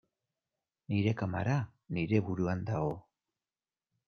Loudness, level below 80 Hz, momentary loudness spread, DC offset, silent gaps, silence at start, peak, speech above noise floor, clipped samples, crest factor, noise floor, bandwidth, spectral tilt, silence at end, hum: -34 LUFS; -64 dBFS; 6 LU; under 0.1%; none; 0.9 s; -16 dBFS; over 58 dB; under 0.1%; 20 dB; under -90 dBFS; 6.6 kHz; -8 dB/octave; 1.05 s; none